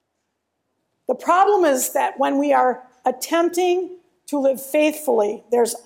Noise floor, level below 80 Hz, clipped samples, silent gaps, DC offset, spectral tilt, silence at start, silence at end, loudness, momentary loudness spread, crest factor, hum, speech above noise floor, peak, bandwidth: -75 dBFS; -76 dBFS; under 0.1%; none; under 0.1%; -2.5 dB/octave; 1.1 s; 0.05 s; -20 LUFS; 9 LU; 16 dB; none; 56 dB; -4 dBFS; 16.5 kHz